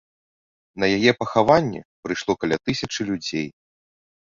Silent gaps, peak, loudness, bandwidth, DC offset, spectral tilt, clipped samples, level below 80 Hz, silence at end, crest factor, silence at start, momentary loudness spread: 1.85-2.03 s; -2 dBFS; -22 LUFS; 7.8 kHz; under 0.1%; -5 dB/octave; under 0.1%; -54 dBFS; 0.85 s; 22 dB; 0.75 s; 12 LU